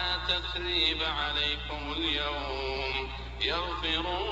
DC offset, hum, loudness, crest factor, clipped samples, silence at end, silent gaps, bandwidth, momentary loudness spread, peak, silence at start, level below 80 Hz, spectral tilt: under 0.1%; none; -29 LUFS; 18 dB; under 0.1%; 0 s; none; 8.2 kHz; 7 LU; -14 dBFS; 0 s; -42 dBFS; -4.5 dB/octave